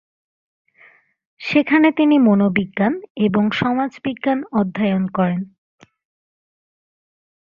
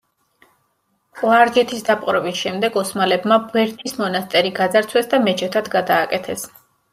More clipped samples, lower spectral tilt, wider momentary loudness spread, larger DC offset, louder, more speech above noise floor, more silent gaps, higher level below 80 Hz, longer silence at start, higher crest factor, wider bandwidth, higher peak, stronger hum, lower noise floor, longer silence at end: neither; first, -8 dB/octave vs -4 dB/octave; about the same, 9 LU vs 8 LU; neither; about the same, -18 LUFS vs -18 LUFS; second, 35 dB vs 49 dB; first, 3.10-3.15 s vs none; first, -58 dBFS vs -64 dBFS; first, 1.4 s vs 1.15 s; about the same, 18 dB vs 18 dB; second, 6.8 kHz vs 16 kHz; about the same, -2 dBFS vs -2 dBFS; neither; second, -52 dBFS vs -67 dBFS; first, 1.95 s vs 0.45 s